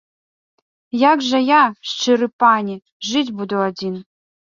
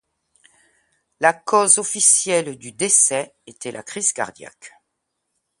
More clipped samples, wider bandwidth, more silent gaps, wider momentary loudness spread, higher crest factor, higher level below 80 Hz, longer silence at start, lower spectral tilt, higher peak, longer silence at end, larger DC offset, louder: neither; second, 7.4 kHz vs 12 kHz; first, 2.33-2.39 s, 2.92-3.00 s vs none; second, 13 LU vs 18 LU; about the same, 18 dB vs 22 dB; about the same, -66 dBFS vs -70 dBFS; second, 0.95 s vs 1.2 s; first, -4 dB/octave vs -1 dB/octave; about the same, -2 dBFS vs 0 dBFS; second, 0.5 s vs 0.9 s; neither; about the same, -17 LUFS vs -16 LUFS